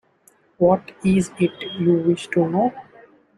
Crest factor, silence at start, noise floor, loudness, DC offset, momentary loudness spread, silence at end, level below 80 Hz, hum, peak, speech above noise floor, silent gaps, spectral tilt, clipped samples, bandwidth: 16 dB; 0.6 s; -58 dBFS; -20 LUFS; under 0.1%; 5 LU; 0.55 s; -54 dBFS; none; -6 dBFS; 38 dB; none; -7 dB/octave; under 0.1%; 11.5 kHz